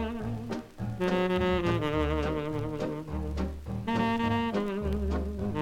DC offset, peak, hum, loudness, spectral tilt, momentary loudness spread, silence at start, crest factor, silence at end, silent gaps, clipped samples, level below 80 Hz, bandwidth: under 0.1%; -14 dBFS; none; -31 LUFS; -7.5 dB/octave; 8 LU; 0 s; 16 dB; 0 s; none; under 0.1%; -40 dBFS; 16 kHz